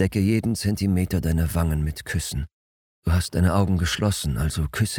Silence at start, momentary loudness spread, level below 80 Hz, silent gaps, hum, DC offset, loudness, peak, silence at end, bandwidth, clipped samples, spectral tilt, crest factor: 0 s; 7 LU; -34 dBFS; 2.53-3.02 s; none; under 0.1%; -24 LUFS; -6 dBFS; 0 s; 18 kHz; under 0.1%; -5.5 dB/octave; 16 dB